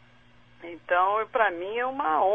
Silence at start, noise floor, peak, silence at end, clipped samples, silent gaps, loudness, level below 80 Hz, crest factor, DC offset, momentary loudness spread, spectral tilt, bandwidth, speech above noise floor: 0.6 s; -57 dBFS; -10 dBFS; 0 s; under 0.1%; none; -26 LUFS; -64 dBFS; 16 dB; 0.1%; 19 LU; -6 dB/octave; 3.9 kHz; 32 dB